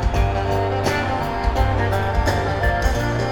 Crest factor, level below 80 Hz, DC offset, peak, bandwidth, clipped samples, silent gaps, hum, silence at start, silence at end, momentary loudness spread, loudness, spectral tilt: 14 dB; -24 dBFS; under 0.1%; -4 dBFS; 18 kHz; under 0.1%; none; none; 0 s; 0 s; 2 LU; -21 LUFS; -6 dB/octave